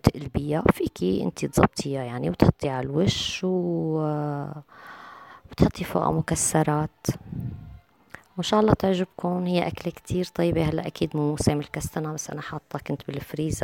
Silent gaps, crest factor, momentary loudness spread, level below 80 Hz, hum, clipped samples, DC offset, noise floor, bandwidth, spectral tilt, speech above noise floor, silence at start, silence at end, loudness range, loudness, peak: none; 22 dB; 13 LU; -44 dBFS; none; under 0.1%; under 0.1%; -49 dBFS; 17 kHz; -5.5 dB/octave; 24 dB; 0.05 s; 0 s; 3 LU; -26 LUFS; -4 dBFS